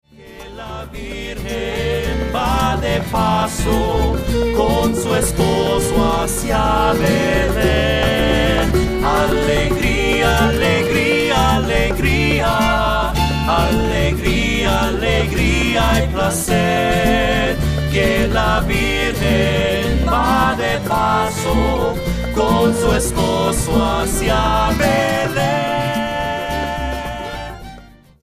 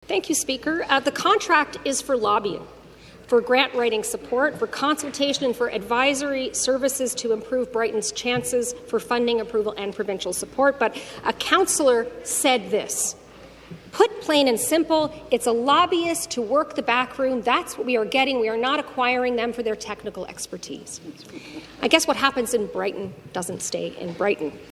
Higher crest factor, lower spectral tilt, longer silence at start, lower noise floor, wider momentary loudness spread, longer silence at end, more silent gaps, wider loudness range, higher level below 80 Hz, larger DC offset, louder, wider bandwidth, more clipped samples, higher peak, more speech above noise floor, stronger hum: second, 14 dB vs 22 dB; first, -5 dB/octave vs -2.5 dB/octave; about the same, 0.2 s vs 0.1 s; second, -41 dBFS vs -46 dBFS; second, 6 LU vs 13 LU; first, 0.35 s vs 0 s; neither; about the same, 3 LU vs 3 LU; first, -24 dBFS vs -56 dBFS; neither; first, -16 LUFS vs -22 LUFS; about the same, 15.5 kHz vs 15.5 kHz; neither; about the same, -2 dBFS vs 0 dBFS; about the same, 25 dB vs 23 dB; neither